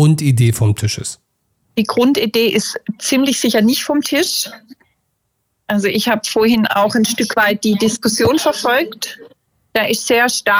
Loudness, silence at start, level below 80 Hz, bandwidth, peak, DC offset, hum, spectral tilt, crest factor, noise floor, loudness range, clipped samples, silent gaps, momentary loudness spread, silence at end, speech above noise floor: -15 LUFS; 0 s; -52 dBFS; over 20 kHz; -4 dBFS; under 0.1%; none; -4.5 dB/octave; 12 dB; -69 dBFS; 3 LU; under 0.1%; none; 8 LU; 0 s; 54 dB